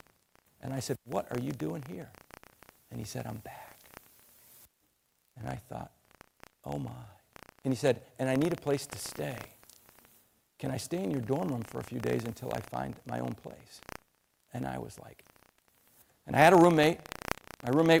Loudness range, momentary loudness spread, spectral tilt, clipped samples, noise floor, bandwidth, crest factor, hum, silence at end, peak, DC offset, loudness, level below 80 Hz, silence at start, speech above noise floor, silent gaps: 18 LU; 23 LU; -5.5 dB/octave; under 0.1%; -74 dBFS; 16.5 kHz; 26 dB; none; 0 s; -8 dBFS; under 0.1%; -31 LUFS; -62 dBFS; 0.65 s; 44 dB; none